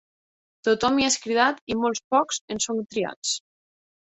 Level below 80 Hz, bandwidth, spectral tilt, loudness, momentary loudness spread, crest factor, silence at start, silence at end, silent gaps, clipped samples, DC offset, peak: -60 dBFS; 8.4 kHz; -2 dB/octave; -24 LUFS; 7 LU; 20 dB; 0.65 s; 0.65 s; 1.61-1.67 s, 2.04-2.11 s, 2.41-2.48 s, 3.16-3.22 s; under 0.1%; under 0.1%; -6 dBFS